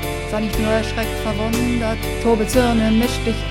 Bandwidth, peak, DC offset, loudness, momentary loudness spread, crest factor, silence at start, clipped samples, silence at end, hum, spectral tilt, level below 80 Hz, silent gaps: 16.5 kHz; -2 dBFS; under 0.1%; -19 LUFS; 6 LU; 16 dB; 0 s; under 0.1%; 0 s; none; -5.5 dB/octave; -28 dBFS; none